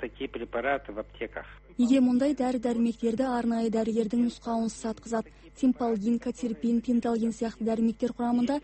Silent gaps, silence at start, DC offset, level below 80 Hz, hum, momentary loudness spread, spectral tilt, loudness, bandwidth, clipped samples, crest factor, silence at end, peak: none; 0 s; under 0.1%; -54 dBFS; none; 12 LU; -6 dB/octave; -28 LUFS; 8.8 kHz; under 0.1%; 14 dB; 0.05 s; -12 dBFS